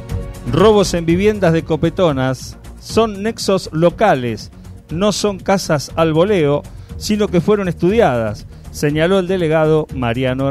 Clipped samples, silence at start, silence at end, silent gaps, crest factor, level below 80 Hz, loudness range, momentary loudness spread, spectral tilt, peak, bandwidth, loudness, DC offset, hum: under 0.1%; 0 s; 0 s; none; 14 dB; -34 dBFS; 2 LU; 13 LU; -6 dB/octave; 0 dBFS; 15 kHz; -16 LUFS; under 0.1%; none